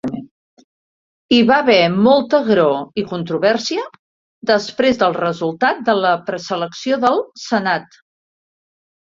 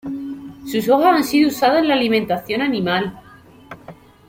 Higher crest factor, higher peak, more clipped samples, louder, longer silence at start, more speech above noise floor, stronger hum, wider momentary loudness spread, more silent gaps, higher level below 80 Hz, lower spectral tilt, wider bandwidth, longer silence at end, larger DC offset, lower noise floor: about the same, 18 dB vs 16 dB; about the same, 0 dBFS vs -2 dBFS; neither; about the same, -16 LUFS vs -17 LUFS; about the same, 0.05 s vs 0.05 s; first, over 74 dB vs 25 dB; neither; second, 11 LU vs 18 LU; first, 0.31-0.57 s, 0.64-1.29 s, 3.99-4.41 s vs none; about the same, -58 dBFS vs -56 dBFS; about the same, -5 dB/octave vs -5 dB/octave; second, 7.6 kHz vs 16.5 kHz; first, 1.25 s vs 0.35 s; neither; first, under -90 dBFS vs -42 dBFS